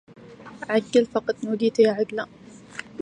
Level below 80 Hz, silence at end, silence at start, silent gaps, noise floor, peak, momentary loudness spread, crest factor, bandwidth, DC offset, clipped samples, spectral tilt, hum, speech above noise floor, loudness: -66 dBFS; 0 s; 0.2 s; none; -41 dBFS; -6 dBFS; 19 LU; 18 dB; 10 kHz; under 0.1%; under 0.1%; -5.5 dB/octave; none; 18 dB; -23 LUFS